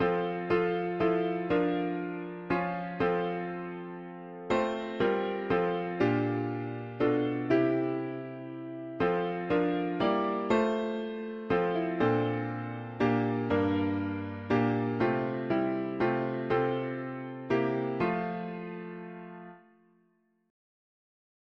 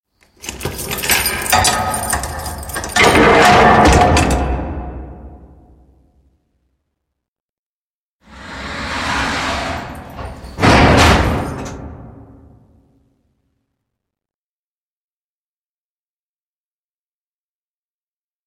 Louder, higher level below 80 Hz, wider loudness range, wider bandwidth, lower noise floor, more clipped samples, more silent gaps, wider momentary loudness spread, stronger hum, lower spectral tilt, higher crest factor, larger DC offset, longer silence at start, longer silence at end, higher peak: second, -31 LUFS vs -13 LUFS; second, -62 dBFS vs -28 dBFS; second, 4 LU vs 16 LU; second, 7.4 kHz vs 16.5 kHz; second, -71 dBFS vs under -90 dBFS; neither; second, none vs 7.28-8.19 s; second, 12 LU vs 22 LU; neither; first, -8 dB/octave vs -4 dB/octave; about the same, 16 dB vs 18 dB; neither; second, 0 s vs 0.45 s; second, 1.9 s vs 6.35 s; second, -14 dBFS vs 0 dBFS